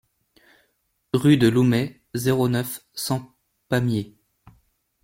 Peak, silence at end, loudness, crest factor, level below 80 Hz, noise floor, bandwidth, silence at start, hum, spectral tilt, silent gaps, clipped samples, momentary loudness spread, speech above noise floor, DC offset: -4 dBFS; 1 s; -22 LUFS; 20 dB; -56 dBFS; -70 dBFS; 16.5 kHz; 1.15 s; none; -6 dB/octave; none; under 0.1%; 13 LU; 50 dB; under 0.1%